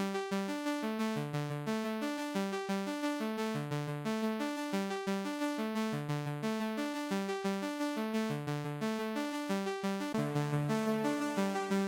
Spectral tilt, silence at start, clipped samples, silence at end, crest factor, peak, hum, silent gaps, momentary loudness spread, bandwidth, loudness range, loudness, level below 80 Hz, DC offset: -5.5 dB/octave; 0 s; under 0.1%; 0 s; 14 dB; -22 dBFS; none; none; 3 LU; 17 kHz; 1 LU; -36 LUFS; -78 dBFS; under 0.1%